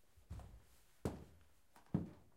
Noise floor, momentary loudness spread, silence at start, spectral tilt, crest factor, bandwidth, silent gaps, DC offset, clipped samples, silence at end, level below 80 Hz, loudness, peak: -70 dBFS; 22 LU; 0.15 s; -8 dB/octave; 24 dB; 16 kHz; none; under 0.1%; under 0.1%; 0.15 s; -62 dBFS; -49 LUFS; -26 dBFS